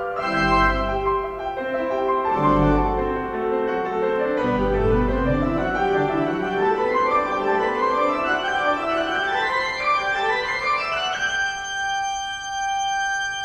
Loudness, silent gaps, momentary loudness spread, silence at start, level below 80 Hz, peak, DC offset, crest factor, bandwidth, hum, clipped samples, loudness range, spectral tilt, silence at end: -22 LUFS; none; 5 LU; 0 s; -36 dBFS; -6 dBFS; under 0.1%; 16 dB; 10 kHz; none; under 0.1%; 1 LU; -4.5 dB/octave; 0 s